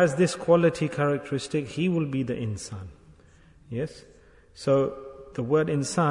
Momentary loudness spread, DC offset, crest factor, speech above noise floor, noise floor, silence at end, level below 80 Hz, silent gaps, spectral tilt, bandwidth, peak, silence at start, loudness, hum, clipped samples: 16 LU; under 0.1%; 18 dB; 30 dB; -55 dBFS; 0 s; -58 dBFS; none; -6 dB/octave; 11 kHz; -8 dBFS; 0 s; -26 LUFS; none; under 0.1%